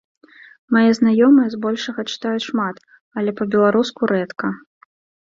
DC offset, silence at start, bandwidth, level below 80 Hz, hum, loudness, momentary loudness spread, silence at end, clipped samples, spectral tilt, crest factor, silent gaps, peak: under 0.1%; 0.7 s; 7.6 kHz; -62 dBFS; none; -18 LUFS; 12 LU; 0.65 s; under 0.1%; -6 dB/octave; 16 dB; 3.01-3.11 s; -2 dBFS